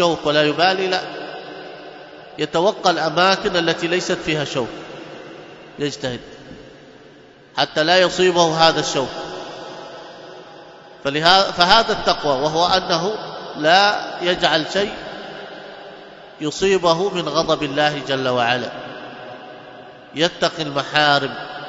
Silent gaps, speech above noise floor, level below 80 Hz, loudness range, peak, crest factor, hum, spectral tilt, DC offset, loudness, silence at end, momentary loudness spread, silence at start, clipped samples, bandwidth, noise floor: none; 27 dB; -52 dBFS; 5 LU; 0 dBFS; 20 dB; none; -3.5 dB/octave; under 0.1%; -18 LUFS; 0 s; 23 LU; 0 s; under 0.1%; 9.6 kHz; -45 dBFS